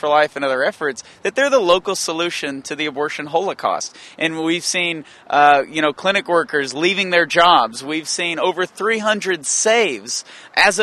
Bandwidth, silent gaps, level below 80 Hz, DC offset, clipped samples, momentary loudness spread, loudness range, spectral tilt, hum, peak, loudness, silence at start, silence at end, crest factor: 13 kHz; none; -60 dBFS; under 0.1%; under 0.1%; 11 LU; 5 LU; -2 dB/octave; none; 0 dBFS; -18 LUFS; 0.05 s; 0 s; 18 dB